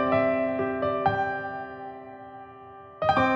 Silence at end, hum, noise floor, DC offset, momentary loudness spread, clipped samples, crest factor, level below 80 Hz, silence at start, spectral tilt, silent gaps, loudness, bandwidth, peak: 0 s; none; -46 dBFS; under 0.1%; 21 LU; under 0.1%; 18 dB; -56 dBFS; 0 s; -7.5 dB/octave; none; -27 LUFS; 7 kHz; -10 dBFS